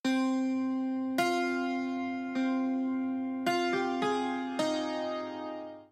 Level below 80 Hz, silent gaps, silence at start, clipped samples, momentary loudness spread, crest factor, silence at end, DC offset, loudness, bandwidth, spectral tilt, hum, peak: -82 dBFS; none; 0.05 s; under 0.1%; 6 LU; 14 dB; 0.05 s; under 0.1%; -32 LUFS; 15 kHz; -4 dB/octave; none; -16 dBFS